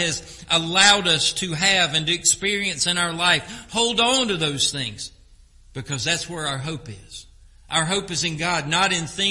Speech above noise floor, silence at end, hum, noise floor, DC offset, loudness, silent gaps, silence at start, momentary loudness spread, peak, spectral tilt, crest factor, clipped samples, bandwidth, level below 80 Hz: 28 dB; 0 s; none; -50 dBFS; under 0.1%; -20 LUFS; none; 0 s; 17 LU; 0 dBFS; -2 dB/octave; 22 dB; under 0.1%; 11.5 kHz; -50 dBFS